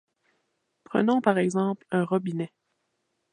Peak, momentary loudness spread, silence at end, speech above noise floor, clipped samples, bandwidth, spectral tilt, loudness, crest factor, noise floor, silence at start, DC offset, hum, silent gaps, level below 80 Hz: -6 dBFS; 10 LU; 0.85 s; 52 dB; under 0.1%; 10.5 kHz; -7 dB/octave; -26 LUFS; 22 dB; -77 dBFS; 0.9 s; under 0.1%; none; none; -78 dBFS